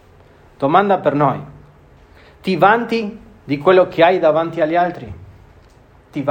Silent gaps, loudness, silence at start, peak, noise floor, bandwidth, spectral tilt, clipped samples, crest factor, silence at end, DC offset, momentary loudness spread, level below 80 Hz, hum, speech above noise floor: none; -16 LUFS; 0.6 s; 0 dBFS; -47 dBFS; 16 kHz; -7.5 dB/octave; under 0.1%; 18 dB; 0 s; under 0.1%; 15 LU; -50 dBFS; none; 32 dB